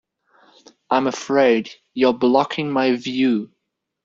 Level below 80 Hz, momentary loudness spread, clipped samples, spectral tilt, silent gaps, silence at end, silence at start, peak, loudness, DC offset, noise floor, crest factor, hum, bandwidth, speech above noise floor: -66 dBFS; 6 LU; under 0.1%; -5 dB/octave; none; 0.6 s; 0.9 s; -2 dBFS; -19 LUFS; under 0.1%; -56 dBFS; 18 dB; none; 7.6 kHz; 38 dB